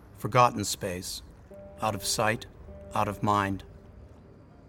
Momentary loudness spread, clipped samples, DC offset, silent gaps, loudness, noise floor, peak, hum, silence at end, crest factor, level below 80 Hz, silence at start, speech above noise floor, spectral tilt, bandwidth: 23 LU; under 0.1%; under 0.1%; none; -28 LUFS; -52 dBFS; -8 dBFS; none; 0 s; 22 dB; -52 dBFS; 0 s; 24 dB; -4 dB/octave; 18 kHz